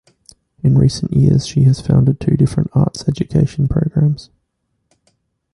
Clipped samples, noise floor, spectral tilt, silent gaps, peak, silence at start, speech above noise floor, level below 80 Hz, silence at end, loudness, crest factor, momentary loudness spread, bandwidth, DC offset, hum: under 0.1%; -69 dBFS; -8 dB/octave; none; -2 dBFS; 0.65 s; 56 dB; -36 dBFS; 1.3 s; -15 LUFS; 14 dB; 5 LU; 11 kHz; under 0.1%; none